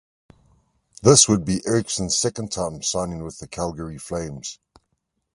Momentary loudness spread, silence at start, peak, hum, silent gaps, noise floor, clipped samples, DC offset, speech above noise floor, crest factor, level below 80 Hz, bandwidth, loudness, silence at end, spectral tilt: 20 LU; 1 s; 0 dBFS; none; none; -74 dBFS; under 0.1%; under 0.1%; 53 dB; 22 dB; -46 dBFS; 11.5 kHz; -21 LUFS; 0.8 s; -4 dB/octave